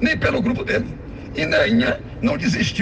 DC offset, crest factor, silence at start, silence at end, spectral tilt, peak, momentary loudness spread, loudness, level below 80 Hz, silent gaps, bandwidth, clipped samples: under 0.1%; 16 dB; 0 s; 0 s; -5.5 dB/octave; -4 dBFS; 11 LU; -20 LUFS; -38 dBFS; none; 8.6 kHz; under 0.1%